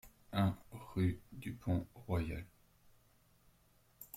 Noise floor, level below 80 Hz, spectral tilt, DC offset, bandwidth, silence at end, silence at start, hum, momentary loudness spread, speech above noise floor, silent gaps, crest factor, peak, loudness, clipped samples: -70 dBFS; -58 dBFS; -7.5 dB/octave; under 0.1%; 16 kHz; 0 s; 0.05 s; none; 13 LU; 33 dB; none; 18 dB; -22 dBFS; -40 LUFS; under 0.1%